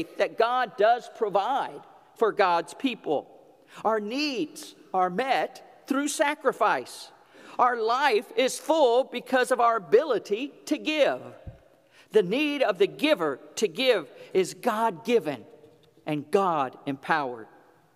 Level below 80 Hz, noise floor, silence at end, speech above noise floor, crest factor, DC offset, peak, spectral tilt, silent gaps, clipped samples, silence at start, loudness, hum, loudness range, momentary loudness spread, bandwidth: -68 dBFS; -58 dBFS; 0.5 s; 32 dB; 20 dB; under 0.1%; -8 dBFS; -4 dB/octave; none; under 0.1%; 0 s; -26 LUFS; none; 4 LU; 11 LU; 15.5 kHz